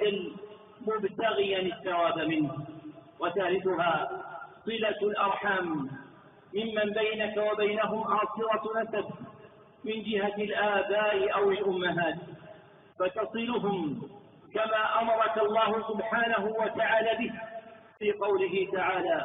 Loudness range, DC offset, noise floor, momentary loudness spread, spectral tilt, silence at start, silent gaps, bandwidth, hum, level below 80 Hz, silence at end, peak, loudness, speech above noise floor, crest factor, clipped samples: 3 LU; under 0.1%; -54 dBFS; 14 LU; -0.5 dB/octave; 0 s; none; 3.9 kHz; none; -68 dBFS; 0 s; -14 dBFS; -29 LUFS; 25 dB; 16 dB; under 0.1%